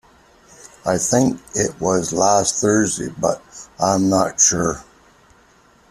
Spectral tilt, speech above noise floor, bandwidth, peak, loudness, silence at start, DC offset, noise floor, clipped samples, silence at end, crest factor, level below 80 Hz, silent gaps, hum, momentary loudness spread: -3.5 dB/octave; 34 dB; 14.5 kHz; -2 dBFS; -18 LUFS; 0.85 s; under 0.1%; -53 dBFS; under 0.1%; 1.1 s; 18 dB; -50 dBFS; none; none; 9 LU